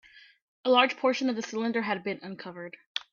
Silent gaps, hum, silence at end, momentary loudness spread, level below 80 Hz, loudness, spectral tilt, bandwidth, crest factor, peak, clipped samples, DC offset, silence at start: 0.42-0.64 s, 2.86-2.95 s; none; 0.1 s; 18 LU; -78 dBFS; -28 LUFS; -4 dB/octave; 7.4 kHz; 22 dB; -8 dBFS; under 0.1%; under 0.1%; 0.15 s